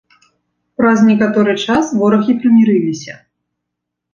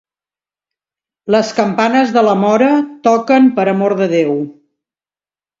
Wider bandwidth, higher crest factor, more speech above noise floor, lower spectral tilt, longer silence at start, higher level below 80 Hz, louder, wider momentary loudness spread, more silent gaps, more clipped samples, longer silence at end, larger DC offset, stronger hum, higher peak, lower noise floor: about the same, 7.4 kHz vs 7.6 kHz; about the same, 14 dB vs 14 dB; second, 66 dB vs over 78 dB; about the same, -6 dB/octave vs -6 dB/octave; second, 0.8 s vs 1.25 s; first, -54 dBFS vs -62 dBFS; about the same, -12 LUFS vs -13 LUFS; first, 13 LU vs 6 LU; neither; neither; about the same, 1 s vs 1.1 s; neither; first, 60 Hz at -40 dBFS vs none; about the same, 0 dBFS vs 0 dBFS; second, -78 dBFS vs under -90 dBFS